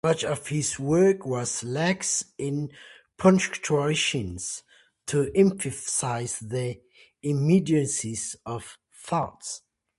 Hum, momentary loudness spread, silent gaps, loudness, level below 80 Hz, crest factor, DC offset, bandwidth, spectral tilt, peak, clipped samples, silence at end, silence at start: none; 15 LU; none; -26 LUFS; -56 dBFS; 20 dB; under 0.1%; 11.5 kHz; -4.5 dB/octave; -6 dBFS; under 0.1%; 0.4 s; 0.05 s